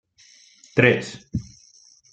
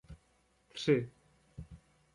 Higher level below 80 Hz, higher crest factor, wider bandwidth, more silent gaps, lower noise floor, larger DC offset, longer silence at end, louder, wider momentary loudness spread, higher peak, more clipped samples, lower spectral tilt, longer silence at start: first, -52 dBFS vs -62 dBFS; about the same, 24 dB vs 22 dB; second, 9 kHz vs 11.5 kHz; neither; second, -54 dBFS vs -72 dBFS; neither; first, 0.7 s vs 0.4 s; first, -22 LUFS vs -33 LUFS; second, 15 LU vs 23 LU; first, 0 dBFS vs -16 dBFS; neither; about the same, -6 dB/octave vs -6.5 dB/octave; first, 0.75 s vs 0.1 s